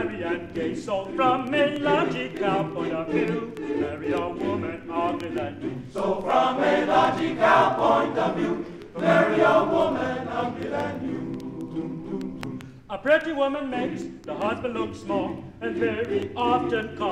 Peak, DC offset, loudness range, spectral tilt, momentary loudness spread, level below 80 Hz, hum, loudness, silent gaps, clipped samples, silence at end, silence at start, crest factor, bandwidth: -6 dBFS; under 0.1%; 6 LU; -6.5 dB/octave; 13 LU; -56 dBFS; none; -25 LUFS; none; under 0.1%; 0 s; 0 s; 18 dB; 12 kHz